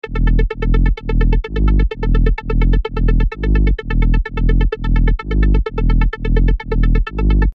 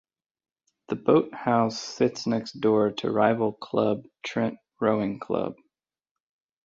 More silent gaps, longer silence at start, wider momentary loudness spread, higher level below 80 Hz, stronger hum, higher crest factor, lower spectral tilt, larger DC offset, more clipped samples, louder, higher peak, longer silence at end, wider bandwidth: neither; second, 0.05 s vs 0.9 s; second, 2 LU vs 7 LU; first, -14 dBFS vs -66 dBFS; neither; second, 12 dB vs 20 dB; first, -9 dB/octave vs -6 dB/octave; neither; neither; first, -18 LUFS vs -26 LUFS; first, 0 dBFS vs -6 dBFS; second, 0.05 s vs 1.15 s; second, 4.7 kHz vs 7.8 kHz